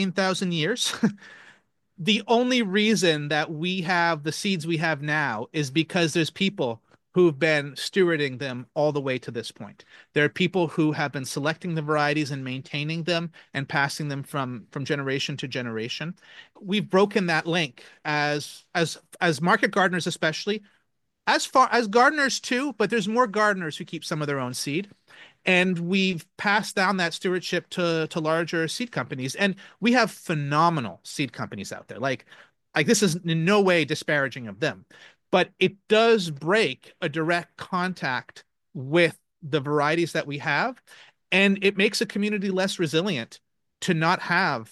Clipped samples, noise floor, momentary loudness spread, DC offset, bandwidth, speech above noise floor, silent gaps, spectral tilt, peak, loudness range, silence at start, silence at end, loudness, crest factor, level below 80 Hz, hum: under 0.1%; -74 dBFS; 10 LU; under 0.1%; 12.5 kHz; 49 dB; none; -4.5 dB/octave; -6 dBFS; 4 LU; 0 s; 0.05 s; -24 LUFS; 20 dB; -72 dBFS; none